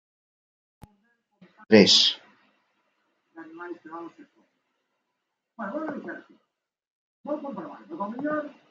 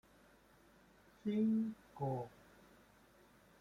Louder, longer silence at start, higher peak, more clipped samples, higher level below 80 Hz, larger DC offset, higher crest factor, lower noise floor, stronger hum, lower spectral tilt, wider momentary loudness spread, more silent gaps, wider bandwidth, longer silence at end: first, -22 LUFS vs -40 LUFS; first, 1.7 s vs 1.25 s; first, -2 dBFS vs -28 dBFS; neither; about the same, -72 dBFS vs -76 dBFS; neither; first, 26 dB vs 16 dB; first, -81 dBFS vs -67 dBFS; neither; second, -3.5 dB/octave vs -9 dB/octave; first, 25 LU vs 11 LU; first, 6.90-7.24 s vs none; second, 9.2 kHz vs 10.5 kHz; second, 0.2 s vs 1.35 s